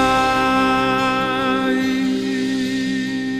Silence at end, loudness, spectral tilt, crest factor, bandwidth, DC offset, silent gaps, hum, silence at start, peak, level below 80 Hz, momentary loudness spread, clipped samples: 0 s; -18 LUFS; -4.5 dB/octave; 14 dB; 14 kHz; under 0.1%; none; none; 0 s; -4 dBFS; -44 dBFS; 5 LU; under 0.1%